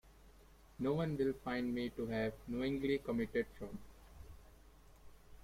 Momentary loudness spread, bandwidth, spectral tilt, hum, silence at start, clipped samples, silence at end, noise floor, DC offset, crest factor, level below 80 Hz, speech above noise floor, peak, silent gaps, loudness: 19 LU; 16 kHz; -7 dB/octave; none; 0.05 s; under 0.1%; 0 s; -62 dBFS; under 0.1%; 16 dB; -60 dBFS; 24 dB; -24 dBFS; none; -39 LUFS